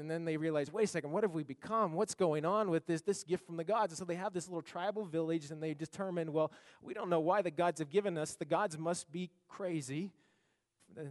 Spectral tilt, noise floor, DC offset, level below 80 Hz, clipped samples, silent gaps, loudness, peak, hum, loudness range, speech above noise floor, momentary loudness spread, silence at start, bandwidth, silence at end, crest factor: -5.5 dB/octave; -78 dBFS; under 0.1%; -82 dBFS; under 0.1%; none; -37 LUFS; -18 dBFS; none; 3 LU; 42 dB; 9 LU; 0 s; 11.5 kHz; 0 s; 18 dB